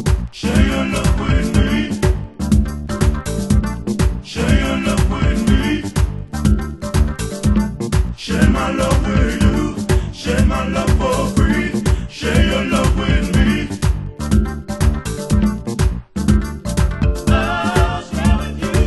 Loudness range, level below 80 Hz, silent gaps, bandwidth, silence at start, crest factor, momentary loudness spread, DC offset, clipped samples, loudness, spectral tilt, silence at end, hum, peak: 2 LU; -20 dBFS; none; 12.5 kHz; 0 s; 16 dB; 5 LU; under 0.1%; under 0.1%; -18 LUFS; -6 dB/octave; 0 s; none; 0 dBFS